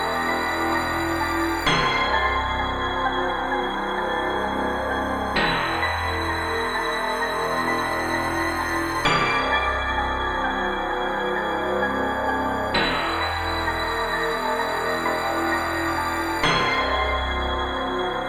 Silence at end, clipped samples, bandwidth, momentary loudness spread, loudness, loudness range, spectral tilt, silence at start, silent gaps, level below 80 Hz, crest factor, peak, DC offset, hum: 0 s; under 0.1%; 17 kHz; 4 LU; -23 LUFS; 1 LU; -4 dB/octave; 0 s; none; -38 dBFS; 16 dB; -6 dBFS; under 0.1%; none